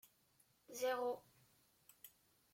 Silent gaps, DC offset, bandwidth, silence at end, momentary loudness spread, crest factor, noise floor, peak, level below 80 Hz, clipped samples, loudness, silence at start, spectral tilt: none; under 0.1%; 16.5 kHz; 0.45 s; 21 LU; 18 dB; -76 dBFS; -30 dBFS; -88 dBFS; under 0.1%; -44 LUFS; 0.7 s; -2 dB/octave